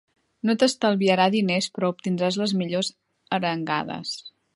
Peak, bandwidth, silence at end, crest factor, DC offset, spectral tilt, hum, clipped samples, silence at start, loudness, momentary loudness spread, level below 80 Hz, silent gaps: -6 dBFS; 11.5 kHz; 0.25 s; 18 dB; under 0.1%; -5 dB/octave; none; under 0.1%; 0.45 s; -24 LUFS; 10 LU; -70 dBFS; none